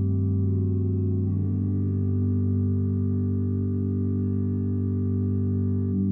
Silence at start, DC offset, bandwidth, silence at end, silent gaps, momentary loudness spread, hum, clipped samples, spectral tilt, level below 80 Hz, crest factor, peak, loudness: 0 s; under 0.1%; 1.6 kHz; 0 s; none; 2 LU; none; under 0.1%; -14.5 dB/octave; -56 dBFS; 8 dB; -16 dBFS; -26 LUFS